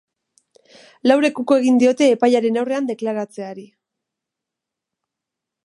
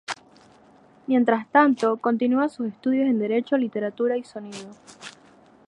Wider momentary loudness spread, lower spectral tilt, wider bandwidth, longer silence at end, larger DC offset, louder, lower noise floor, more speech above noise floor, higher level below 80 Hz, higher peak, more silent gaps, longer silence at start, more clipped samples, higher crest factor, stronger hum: second, 16 LU vs 22 LU; about the same, -4.5 dB/octave vs -5.5 dB/octave; about the same, 11 kHz vs 10.5 kHz; first, 2 s vs 0.6 s; neither; first, -17 LUFS vs -23 LUFS; first, -84 dBFS vs -54 dBFS; first, 67 dB vs 32 dB; about the same, -76 dBFS vs -74 dBFS; about the same, -2 dBFS vs -4 dBFS; neither; first, 1.05 s vs 0.1 s; neither; about the same, 20 dB vs 20 dB; neither